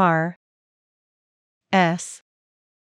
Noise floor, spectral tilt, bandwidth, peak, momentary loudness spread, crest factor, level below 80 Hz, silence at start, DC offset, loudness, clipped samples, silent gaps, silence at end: under -90 dBFS; -5.5 dB/octave; 11.5 kHz; -6 dBFS; 16 LU; 20 dB; -88 dBFS; 0 s; under 0.1%; -22 LUFS; under 0.1%; 0.36-1.61 s; 0.8 s